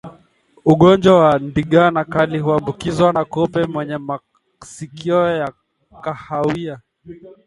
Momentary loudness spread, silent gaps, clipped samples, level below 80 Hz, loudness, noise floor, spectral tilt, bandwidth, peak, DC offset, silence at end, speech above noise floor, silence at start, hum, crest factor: 17 LU; none; under 0.1%; -48 dBFS; -16 LUFS; -53 dBFS; -7 dB/octave; 11.5 kHz; 0 dBFS; under 0.1%; 0.15 s; 37 dB; 0.05 s; none; 18 dB